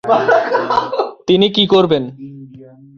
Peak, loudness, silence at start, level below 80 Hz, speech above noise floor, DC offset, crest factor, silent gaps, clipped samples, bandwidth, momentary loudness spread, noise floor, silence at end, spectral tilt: 0 dBFS; -14 LUFS; 0.05 s; -52 dBFS; 26 dB; under 0.1%; 14 dB; none; under 0.1%; 7 kHz; 15 LU; -39 dBFS; 0.3 s; -6 dB/octave